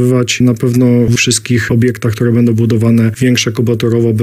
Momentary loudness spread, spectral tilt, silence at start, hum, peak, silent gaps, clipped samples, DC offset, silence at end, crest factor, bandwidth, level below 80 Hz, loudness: 3 LU; -5.5 dB/octave; 0 s; none; 0 dBFS; none; under 0.1%; under 0.1%; 0 s; 10 dB; 15.5 kHz; -42 dBFS; -11 LUFS